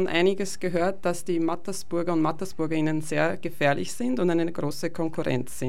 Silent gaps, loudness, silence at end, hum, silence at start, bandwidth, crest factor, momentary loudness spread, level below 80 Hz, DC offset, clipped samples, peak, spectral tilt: none; -27 LUFS; 0 s; none; 0 s; 16 kHz; 16 dB; 5 LU; -58 dBFS; 3%; under 0.1%; -10 dBFS; -5.5 dB/octave